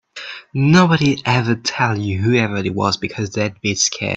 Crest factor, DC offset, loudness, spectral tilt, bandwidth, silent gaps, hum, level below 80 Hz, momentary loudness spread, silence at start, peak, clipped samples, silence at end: 18 dB; under 0.1%; -17 LUFS; -4.5 dB/octave; 8.2 kHz; none; none; -50 dBFS; 9 LU; 0.15 s; 0 dBFS; under 0.1%; 0 s